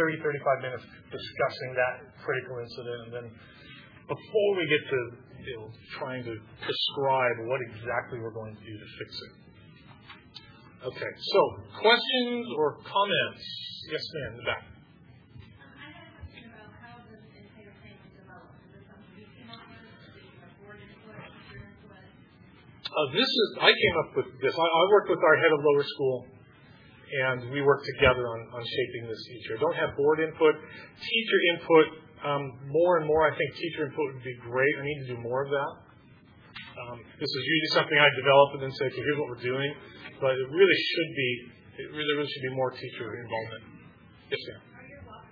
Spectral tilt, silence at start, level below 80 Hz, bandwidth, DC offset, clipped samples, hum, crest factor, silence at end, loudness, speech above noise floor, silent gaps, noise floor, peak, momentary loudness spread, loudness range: -6.5 dB/octave; 0 s; -60 dBFS; 5.2 kHz; under 0.1%; under 0.1%; none; 24 dB; 0.1 s; -27 LUFS; 27 dB; none; -55 dBFS; -4 dBFS; 25 LU; 9 LU